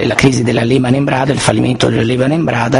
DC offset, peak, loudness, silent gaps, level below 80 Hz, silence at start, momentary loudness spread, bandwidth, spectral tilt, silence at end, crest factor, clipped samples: under 0.1%; 0 dBFS; -12 LUFS; none; -38 dBFS; 0 s; 2 LU; 11 kHz; -5.5 dB/octave; 0 s; 12 dB; 0.2%